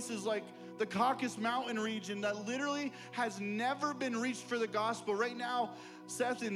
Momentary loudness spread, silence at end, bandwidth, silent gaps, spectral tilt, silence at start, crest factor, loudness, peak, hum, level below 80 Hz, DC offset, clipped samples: 7 LU; 0 s; 15 kHz; none; -4 dB/octave; 0 s; 18 dB; -36 LUFS; -18 dBFS; none; -84 dBFS; under 0.1%; under 0.1%